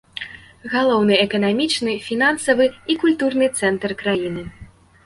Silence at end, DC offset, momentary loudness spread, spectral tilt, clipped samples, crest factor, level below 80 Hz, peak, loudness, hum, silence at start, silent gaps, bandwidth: 0.4 s; under 0.1%; 16 LU; -4 dB/octave; under 0.1%; 18 dB; -52 dBFS; -2 dBFS; -19 LUFS; none; 0.15 s; none; 11.5 kHz